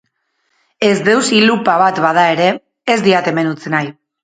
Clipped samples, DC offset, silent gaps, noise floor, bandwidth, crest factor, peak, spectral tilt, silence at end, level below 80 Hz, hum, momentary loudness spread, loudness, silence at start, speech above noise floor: under 0.1%; under 0.1%; none; -66 dBFS; 9.4 kHz; 14 dB; 0 dBFS; -4.5 dB/octave; 0.3 s; -60 dBFS; none; 7 LU; -13 LUFS; 0.8 s; 53 dB